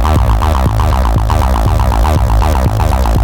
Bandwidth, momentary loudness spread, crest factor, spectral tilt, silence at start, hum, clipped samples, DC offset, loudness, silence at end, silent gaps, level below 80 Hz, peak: 17.5 kHz; 1 LU; 8 dB; -6.5 dB/octave; 0 s; none; under 0.1%; 0.9%; -12 LUFS; 0 s; none; -12 dBFS; -2 dBFS